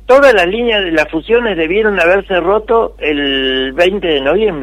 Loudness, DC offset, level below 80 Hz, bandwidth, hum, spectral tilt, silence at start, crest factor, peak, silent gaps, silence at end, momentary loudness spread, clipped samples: -12 LUFS; under 0.1%; -34 dBFS; 13.5 kHz; none; -5 dB/octave; 0.05 s; 12 dB; 0 dBFS; none; 0 s; 5 LU; under 0.1%